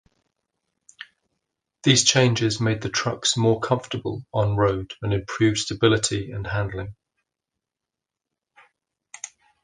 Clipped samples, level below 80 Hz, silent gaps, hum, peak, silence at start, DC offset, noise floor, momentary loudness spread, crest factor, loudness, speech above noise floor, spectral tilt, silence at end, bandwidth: under 0.1%; -48 dBFS; none; none; -2 dBFS; 1 s; under 0.1%; -87 dBFS; 21 LU; 22 dB; -22 LUFS; 65 dB; -4 dB/octave; 0.35 s; 10 kHz